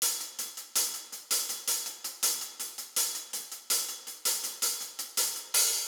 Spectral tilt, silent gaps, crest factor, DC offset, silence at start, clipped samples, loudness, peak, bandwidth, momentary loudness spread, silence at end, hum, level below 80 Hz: 3.5 dB/octave; none; 20 dB; under 0.1%; 0 s; under 0.1%; -30 LUFS; -12 dBFS; over 20 kHz; 8 LU; 0 s; none; under -90 dBFS